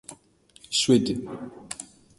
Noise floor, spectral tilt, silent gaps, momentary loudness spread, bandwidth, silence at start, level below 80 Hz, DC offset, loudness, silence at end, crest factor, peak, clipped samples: -58 dBFS; -4 dB/octave; none; 18 LU; 11.5 kHz; 0.1 s; -60 dBFS; under 0.1%; -23 LUFS; 0.35 s; 20 dB; -6 dBFS; under 0.1%